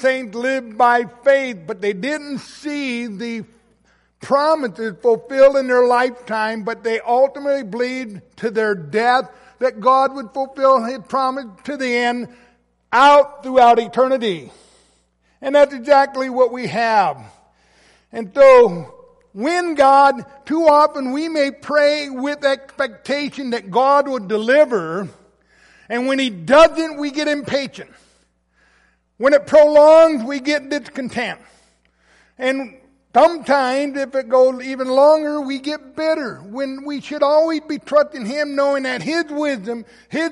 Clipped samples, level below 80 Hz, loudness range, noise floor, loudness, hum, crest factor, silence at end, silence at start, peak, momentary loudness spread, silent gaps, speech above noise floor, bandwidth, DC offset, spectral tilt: under 0.1%; -56 dBFS; 5 LU; -61 dBFS; -17 LUFS; none; 16 dB; 0 s; 0 s; -2 dBFS; 15 LU; none; 44 dB; 11.5 kHz; under 0.1%; -4.5 dB/octave